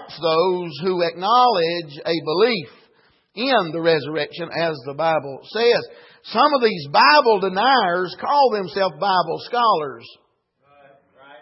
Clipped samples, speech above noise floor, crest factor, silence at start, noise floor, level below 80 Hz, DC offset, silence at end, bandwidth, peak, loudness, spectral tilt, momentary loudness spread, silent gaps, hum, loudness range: under 0.1%; 44 dB; 18 dB; 0 s; -63 dBFS; -72 dBFS; under 0.1%; 1.3 s; 5.8 kHz; -2 dBFS; -19 LUFS; -8 dB/octave; 11 LU; none; none; 5 LU